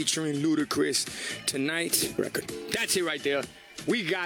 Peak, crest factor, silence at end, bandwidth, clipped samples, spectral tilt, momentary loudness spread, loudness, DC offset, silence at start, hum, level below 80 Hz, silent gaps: -8 dBFS; 20 dB; 0 s; over 20 kHz; under 0.1%; -2.5 dB/octave; 6 LU; -28 LUFS; under 0.1%; 0 s; none; -64 dBFS; none